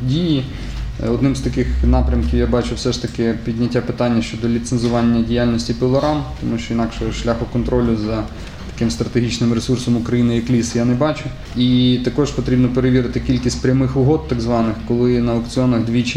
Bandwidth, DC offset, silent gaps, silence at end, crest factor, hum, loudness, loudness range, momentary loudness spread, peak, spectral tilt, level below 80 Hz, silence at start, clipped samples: 11 kHz; under 0.1%; none; 0 s; 14 dB; none; -18 LUFS; 3 LU; 6 LU; -2 dBFS; -6.5 dB/octave; -28 dBFS; 0 s; under 0.1%